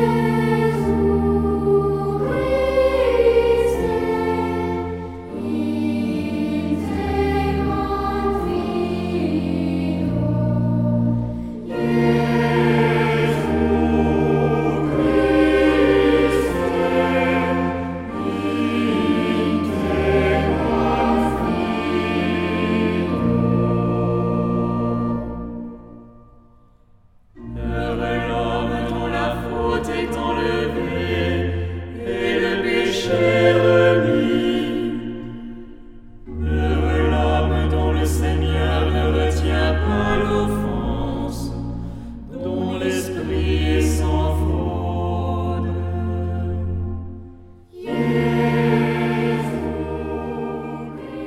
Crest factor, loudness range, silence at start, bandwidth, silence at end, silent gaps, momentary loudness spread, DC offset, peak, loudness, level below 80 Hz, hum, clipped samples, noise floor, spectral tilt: 16 dB; 6 LU; 0 s; 15.5 kHz; 0 s; none; 10 LU; under 0.1%; -4 dBFS; -20 LUFS; -30 dBFS; none; under 0.1%; -51 dBFS; -7 dB/octave